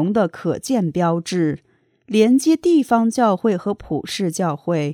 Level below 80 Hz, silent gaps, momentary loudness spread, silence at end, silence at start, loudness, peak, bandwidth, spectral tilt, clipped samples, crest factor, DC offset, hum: -54 dBFS; none; 9 LU; 0 s; 0 s; -19 LUFS; -4 dBFS; 17 kHz; -6 dB/octave; under 0.1%; 16 dB; under 0.1%; none